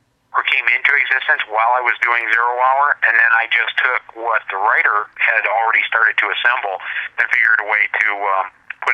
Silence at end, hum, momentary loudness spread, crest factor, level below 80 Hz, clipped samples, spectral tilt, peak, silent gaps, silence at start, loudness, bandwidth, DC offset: 0 s; none; 8 LU; 16 dB; -70 dBFS; under 0.1%; -1 dB/octave; 0 dBFS; none; 0.35 s; -15 LUFS; 10.5 kHz; under 0.1%